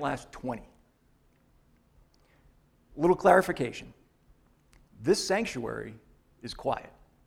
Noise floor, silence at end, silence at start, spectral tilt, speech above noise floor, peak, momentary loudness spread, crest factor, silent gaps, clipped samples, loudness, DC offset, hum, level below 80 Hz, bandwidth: -66 dBFS; 0.4 s; 0 s; -5 dB/octave; 38 dB; -6 dBFS; 21 LU; 26 dB; none; under 0.1%; -28 LUFS; under 0.1%; none; -58 dBFS; 16 kHz